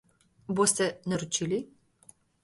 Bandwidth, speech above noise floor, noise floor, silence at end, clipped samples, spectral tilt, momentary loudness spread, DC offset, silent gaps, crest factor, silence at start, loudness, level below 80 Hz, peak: 12 kHz; 31 dB; -60 dBFS; 0.8 s; under 0.1%; -3.5 dB/octave; 17 LU; under 0.1%; none; 22 dB; 0.5 s; -28 LUFS; -66 dBFS; -10 dBFS